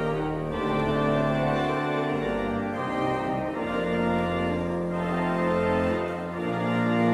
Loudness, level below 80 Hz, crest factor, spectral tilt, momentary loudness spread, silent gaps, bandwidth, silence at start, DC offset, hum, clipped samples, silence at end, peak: -27 LUFS; -46 dBFS; 14 dB; -7.5 dB/octave; 5 LU; none; 12 kHz; 0 s; under 0.1%; none; under 0.1%; 0 s; -12 dBFS